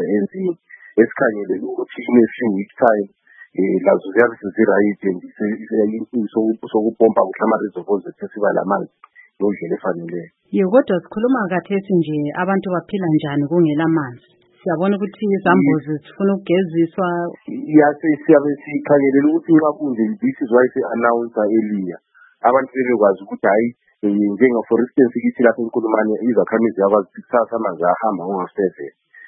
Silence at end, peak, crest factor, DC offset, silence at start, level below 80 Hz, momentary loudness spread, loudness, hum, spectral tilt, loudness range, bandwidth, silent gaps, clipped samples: 0.4 s; 0 dBFS; 18 dB; under 0.1%; 0 s; -66 dBFS; 9 LU; -18 LUFS; none; -11.5 dB/octave; 3 LU; 4 kHz; none; under 0.1%